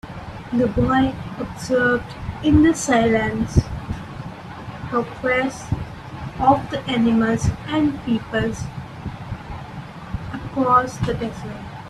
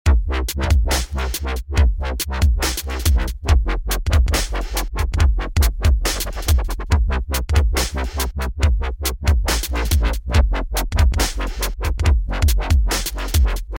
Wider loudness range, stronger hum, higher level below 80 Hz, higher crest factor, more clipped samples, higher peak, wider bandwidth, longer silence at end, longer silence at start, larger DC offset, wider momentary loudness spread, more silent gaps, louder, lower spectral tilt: first, 5 LU vs 1 LU; neither; second, -36 dBFS vs -18 dBFS; first, 20 dB vs 14 dB; neither; about the same, -2 dBFS vs -4 dBFS; second, 13 kHz vs 17 kHz; about the same, 0 s vs 0 s; about the same, 0.05 s vs 0.05 s; neither; first, 16 LU vs 6 LU; neither; about the same, -21 LUFS vs -20 LUFS; first, -6 dB/octave vs -4.5 dB/octave